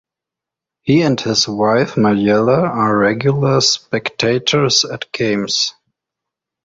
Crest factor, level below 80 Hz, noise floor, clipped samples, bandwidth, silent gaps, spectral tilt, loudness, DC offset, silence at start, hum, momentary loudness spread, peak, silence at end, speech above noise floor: 16 dB; -52 dBFS; -85 dBFS; under 0.1%; 7.8 kHz; none; -4.5 dB/octave; -15 LUFS; under 0.1%; 0.85 s; none; 5 LU; 0 dBFS; 0.95 s; 70 dB